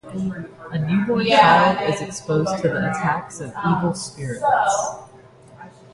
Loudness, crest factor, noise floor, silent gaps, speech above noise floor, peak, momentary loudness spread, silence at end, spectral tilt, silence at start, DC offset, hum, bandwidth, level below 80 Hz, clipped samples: -20 LUFS; 20 dB; -46 dBFS; none; 26 dB; -2 dBFS; 15 LU; 0.25 s; -5 dB/octave; 0.05 s; under 0.1%; none; 11.5 kHz; -54 dBFS; under 0.1%